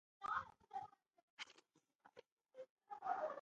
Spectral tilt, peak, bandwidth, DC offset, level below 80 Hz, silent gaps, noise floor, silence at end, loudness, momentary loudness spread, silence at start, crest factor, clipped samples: -3 dB/octave; -30 dBFS; 9 kHz; under 0.1%; -84 dBFS; 1.23-1.37 s, 1.95-1.99 s, 2.32-2.37 s, 2.70-2.76 s; -76 dBFS; 0 s; -49 LUFS; 22 LU; 0.2 s; 22 dB; under 0.1%